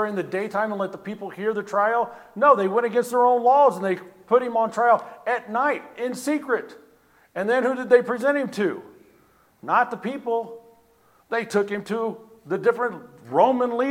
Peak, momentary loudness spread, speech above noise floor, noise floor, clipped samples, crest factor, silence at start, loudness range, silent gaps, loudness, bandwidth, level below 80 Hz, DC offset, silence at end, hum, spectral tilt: -4 dBFS; 12 LU; 37 dB; -59 dBFS; under 0.1%; 20 dB; 0 s; 7 LU; none; -23 LUFS; 15.5 kHz; -74 dBFS; under 0.1%; 0 s; none; -5.5 dB/octave